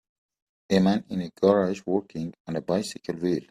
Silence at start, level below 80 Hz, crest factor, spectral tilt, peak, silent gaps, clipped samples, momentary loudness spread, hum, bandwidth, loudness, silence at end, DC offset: 0.7 s; -62 dBFS; 20 dB; -6.5 dB/octave; -6 dBFS; 2.40-2.45 s; under 0.1%; 11 LU; none; 13 kHz; -26 LUFS; 0.05 s; under 0.1%